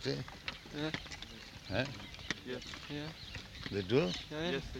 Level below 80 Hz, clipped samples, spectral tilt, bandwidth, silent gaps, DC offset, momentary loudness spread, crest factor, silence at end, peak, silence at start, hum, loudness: -56 dBFS; under 0.1%; -5 dB/octave; 16 kHz; none; under 0.1%; 13 LU; 22 dB; 0 s; -16 dBFS; 0 s; none; -39 LUFS